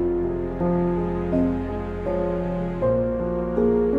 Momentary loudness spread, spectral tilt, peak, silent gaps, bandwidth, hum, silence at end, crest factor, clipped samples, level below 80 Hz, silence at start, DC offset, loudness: 5 LU; -10.5 dB/octave; -8 dBFS; none; 4.8 kHz; none; 0 s; 14 dB; under 0.1%; -36 dBFS; 0 s; under 0.1%; -24 LUFS